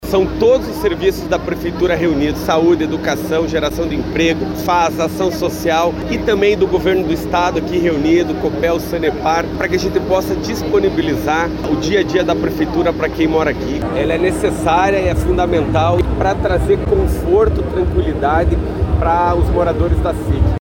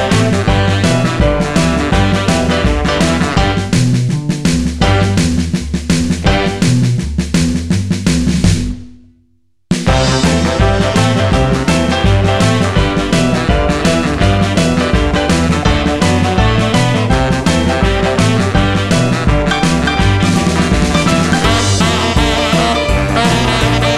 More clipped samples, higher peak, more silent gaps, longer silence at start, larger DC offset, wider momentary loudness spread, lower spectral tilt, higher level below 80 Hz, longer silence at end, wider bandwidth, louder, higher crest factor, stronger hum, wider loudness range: neither; about the same, -2 dBFS vs 0 dBFS; neither; about the same, 0 s vs 0 s; neither; about the same, 5 LU vs 3 LU; about the same, -6.5 dB/octave vs -5.5 dB/octave; about the same, -26 dBFS vs -22 dBFS; about the same, 0 s vs 0 s; first, 17 kHz vs 14 kHz; second, -16 LUFS vs -12 LUFS; about the same, 12 dB vs 12 dB; neither; about the same, 1 LU vs 2 LU